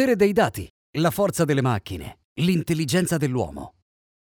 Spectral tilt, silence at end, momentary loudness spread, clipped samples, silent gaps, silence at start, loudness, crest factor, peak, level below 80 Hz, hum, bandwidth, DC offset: -5.5 dB/octave; 0.6 s; 17 LU; under 0.1%; 0.70-0.93 s, 2.24-2.36 s; 0 s; -23 LUFS; 16 dB; -6 dBFS; -50 dBFS; none; over 20 kHz; under 0.1%